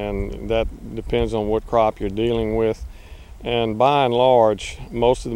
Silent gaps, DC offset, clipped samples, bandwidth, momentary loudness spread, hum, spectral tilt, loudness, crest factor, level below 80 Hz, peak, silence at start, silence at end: none; under 0.1%; under 0.1%; 13 kHz; 13 LU; none; -6 dB/octave; -20 LUFS; 18 dB; -34 dBFS; -2 dBFS; 0 s; 0 s